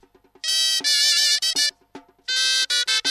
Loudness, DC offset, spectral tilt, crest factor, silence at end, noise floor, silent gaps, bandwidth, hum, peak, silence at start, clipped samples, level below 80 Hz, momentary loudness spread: -18 LUFS; under 0.1%; 4 dB/octave; 18 dB; 0 s; -47 dBFS; none; 16 kHz; none; -4 dBFS; 0.45 s; under 0.1%; -70 dBFS; 8 LU